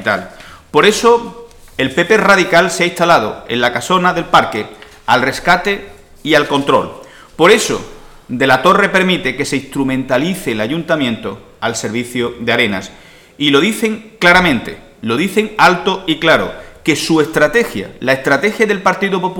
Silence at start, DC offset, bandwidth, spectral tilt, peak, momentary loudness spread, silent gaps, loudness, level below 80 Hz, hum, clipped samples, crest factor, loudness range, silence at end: 0 s; under 0.1%; 18.5 kHz; -4 dB/octave; 0 dBFS; 12 LU; none; -13 LUFS; -42 dBFS; none; under 0.1%; 14 dB; 4 LU; 0 s